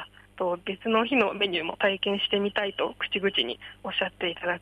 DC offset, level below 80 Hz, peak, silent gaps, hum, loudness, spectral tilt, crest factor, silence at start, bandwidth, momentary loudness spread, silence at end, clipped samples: under 0.1%; -62 dBFS; -10 dBFS; none; none; -27 LUFS; -6 dB/octave; 18 dB; 0 s; 11.5 kHz; 7 LU; 0 s; under 0.1%